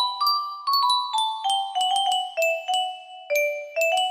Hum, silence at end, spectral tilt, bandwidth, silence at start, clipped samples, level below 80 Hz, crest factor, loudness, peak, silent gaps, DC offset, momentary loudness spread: none; 0 s; 3 dB/octave; 15.5 kHz; 0 s; under 0.1%; -78 dBFS; 14 dB; -23 LUFS; -10 dBFS; none; under 0.1%; 5 LU